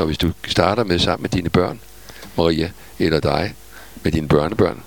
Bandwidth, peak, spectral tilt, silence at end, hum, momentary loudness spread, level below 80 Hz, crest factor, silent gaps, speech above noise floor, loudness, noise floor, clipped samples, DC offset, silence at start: 19.5 kHz; 0 dBFS; -6 dB/octave; 0.05 s; none; 16 LU; -36 dBFS; 20 dB; none; 21 dB; -19 LUFS; -40 dBFS; under 0.1%; 0.7%; 0 s